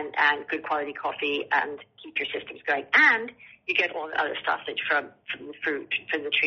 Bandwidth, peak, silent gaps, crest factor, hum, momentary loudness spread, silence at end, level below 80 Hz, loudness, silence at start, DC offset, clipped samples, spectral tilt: 6.4 kHz; -6 dBFS; none; 22 dB; none; 14 LU; 0 s; -74 dBFS; -25 LUFS; 0 s; under 0.1%; under 0.1%; 1.5 dB/octave